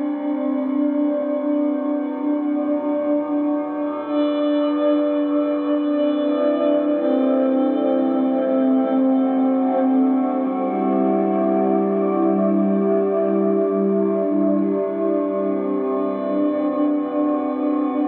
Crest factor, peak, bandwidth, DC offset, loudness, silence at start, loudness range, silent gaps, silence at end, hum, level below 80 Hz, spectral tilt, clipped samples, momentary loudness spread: 12 dB; -6 dBFS; 4.2 kHz; under 0.1%; -20 LUFS; 0 s; 3 LU; none; 0 s; none; -80 dBFS; -12 dB/octave; under 0.1%; 4 LU